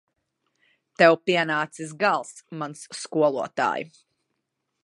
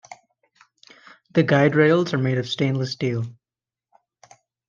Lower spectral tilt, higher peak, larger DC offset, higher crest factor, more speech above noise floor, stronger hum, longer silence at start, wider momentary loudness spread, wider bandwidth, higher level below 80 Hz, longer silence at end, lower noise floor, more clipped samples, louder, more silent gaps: second, -4.5 dB/octave vs -7 dB/octave; about the same, -2 dBFS vs -4 dBFS; neither; about the same, 24 dB vs 20 dB; second, 55 dB vs over 70 dB; neither; first, 1 s vs 0.1 s; first, 16 LU vs 9 LU; first, 11.5 kHz vs 7.4 kHz; second, -78 dBFS vs -68 dBFS; second, 0.95 s vs 1.35 s; second, -79 dBFS vs under -90 dBFS; neither; about the same, -23 LUFS vs -21 LUFS; neither